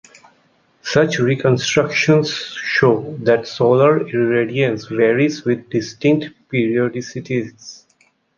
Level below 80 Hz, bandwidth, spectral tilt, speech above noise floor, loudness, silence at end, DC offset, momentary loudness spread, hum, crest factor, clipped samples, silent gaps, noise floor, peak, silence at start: -56 dBFS; 7.4 kHz; -5.5 dB/octave; 43 dB; -17 LUFS; 0.65 s; under 0.1%; 9 LU; none; 16 dB; under 0.1%; none; -59 dBFS; -2 dBFS; 0.85 s